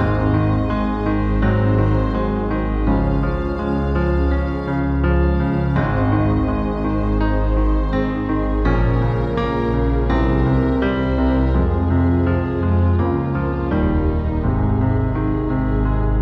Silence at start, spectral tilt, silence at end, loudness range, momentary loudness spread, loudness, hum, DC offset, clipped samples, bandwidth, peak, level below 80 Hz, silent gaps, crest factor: 0 s; -10 dB/octave; 0 s; 2 LU; 4 LU; -19 LUFS; none; under 0.1%; under 0.1%; 5.2 kHz; -6 dBFS; -22 dBFS; none; 12 dB